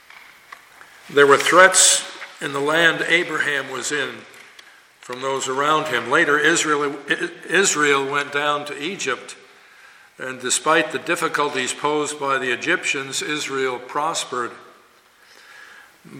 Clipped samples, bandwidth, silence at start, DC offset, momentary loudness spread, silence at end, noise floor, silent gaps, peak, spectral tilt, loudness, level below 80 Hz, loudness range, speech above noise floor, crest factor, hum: under 0.1%; 17 kHz; 1.05 s; under 0.1%; 14 LU; 0 s; -53 dBFS; none; 0 dBFS; -1.5 dB/octave; -19 LUFS; -72 dBFS; 7 LU; 33 dB; 20 dB; none